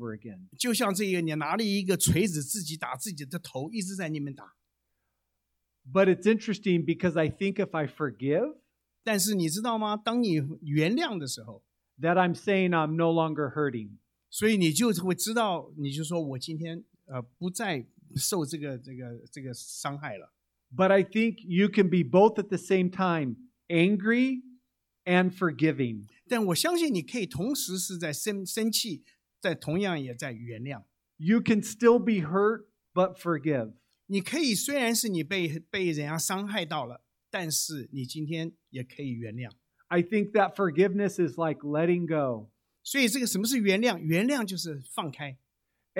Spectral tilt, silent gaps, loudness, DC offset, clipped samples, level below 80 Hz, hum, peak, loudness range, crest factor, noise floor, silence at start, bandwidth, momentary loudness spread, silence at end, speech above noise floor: -4.5 dB/octave; none; -28 LUFS; under 0.1%; under 0.1%; -64 dBFS; none; -8 dBFS; 7 LU; 20 dB; -80 dBFS; 0 s; 17 kHz; 14 LU; 0 s; 53 dB